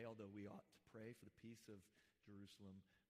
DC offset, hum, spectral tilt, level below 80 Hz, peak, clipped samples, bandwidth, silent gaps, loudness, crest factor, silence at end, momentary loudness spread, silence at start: under 0.1%; none; -6 dB/octave; under -90 dBFS; -44 dBFS; under 0.1%; 15.5 kHz; none; -61 LUFS; 16 dB; 0.1 s; 9 LU; 0 s